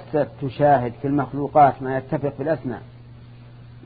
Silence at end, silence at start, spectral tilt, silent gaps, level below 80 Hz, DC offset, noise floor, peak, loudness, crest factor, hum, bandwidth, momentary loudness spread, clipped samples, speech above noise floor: 0 s; 0 s; -12 dB/octave; none; -50 dBFS; under 0.1%; -43 dBFS; -4 dBFS; -21 LUFS; 18 dB; none; 4.9 kHz; 11 LU; under 0.1%; 22 dB